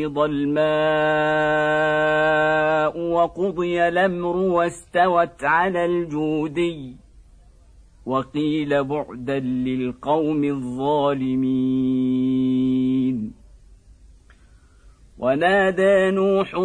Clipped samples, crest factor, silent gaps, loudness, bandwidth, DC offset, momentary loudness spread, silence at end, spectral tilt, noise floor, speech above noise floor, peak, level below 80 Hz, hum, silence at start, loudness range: under 0.1%; 14 dB; none; -21 LUFS; 10 kHz; under 0.1%; 7 LU; 0 s; -7 dB/octave; -51 dBFS; 31 dB; -6 dBFS; -50 dBFS; none; 0 s; 6 LU